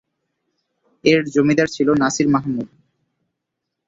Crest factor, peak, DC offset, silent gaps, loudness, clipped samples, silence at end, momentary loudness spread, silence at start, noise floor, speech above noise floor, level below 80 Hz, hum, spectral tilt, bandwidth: 18 dB; -2 dBFS; under 0.1%; none; -18 LUFS; under 0.1%; 1.2 s; 10 LU; 1.05 s; -79 dBFS; 63 dB; -56 dBFS; none; -5 dB/octave; 7.8 kHz